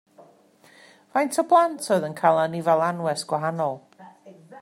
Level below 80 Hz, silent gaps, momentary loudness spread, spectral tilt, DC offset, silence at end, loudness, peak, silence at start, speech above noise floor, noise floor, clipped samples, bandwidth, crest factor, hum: -76 dBFS; none; 9 LU; -5 dB/octave; under 0.1%; 0 s; -23 LUFS; -4 dBFS; 1.15 s; 33 dB; -55 dBFS; under 0.1%; 15.5 kHz; 20 dB; none